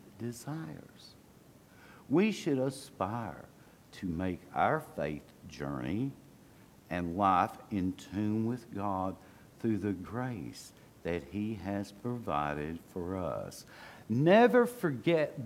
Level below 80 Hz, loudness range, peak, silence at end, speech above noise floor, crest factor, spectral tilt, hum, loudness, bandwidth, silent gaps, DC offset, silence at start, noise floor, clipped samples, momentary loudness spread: -62 dBFS; 7 LU; -12 dBFS; 0 s; 26 dB; 22 dB; -6.5 dB/octave; none; -33 LUFS; 16.5 kHz; none; under 0.1%; 0.05 s; -59 dBFS; under 0.1%; 17 LU